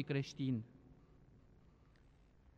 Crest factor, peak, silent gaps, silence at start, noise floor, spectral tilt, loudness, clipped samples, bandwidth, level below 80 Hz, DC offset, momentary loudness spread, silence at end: 20 dB; -24 dBFS; none; 0 s; -67 dBFS; -7 dB/octave; -41 LUFS; under 0.1%; 7.6 kHz; -70 dBFS; under 0.1%; 26 LU; 1.2 s